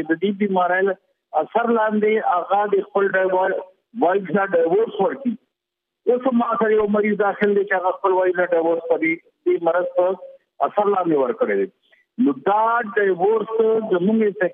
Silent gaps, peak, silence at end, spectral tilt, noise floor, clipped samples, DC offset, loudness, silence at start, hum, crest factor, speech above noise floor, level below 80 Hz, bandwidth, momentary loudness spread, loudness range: none; -6 dBFS; 0 s; -10 dB/octave; -82 dBFS; under 0.1%; under 0.1%; -20 LUFS; 0 s; none; 14 dB; 63 dB; -68 dBFS; 3.8 kHz; 6 LU; 2 LU